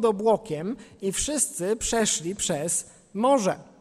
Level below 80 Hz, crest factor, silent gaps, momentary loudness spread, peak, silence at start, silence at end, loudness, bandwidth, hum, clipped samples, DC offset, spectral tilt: -50 dBFS; 18 dB; none; 10 LU; -8 dBFS; 0 s; 0.15 s; -25 LUFS; 15.5 kHz; none; under 0.1%; under 0.1%; -3.5 dB/octave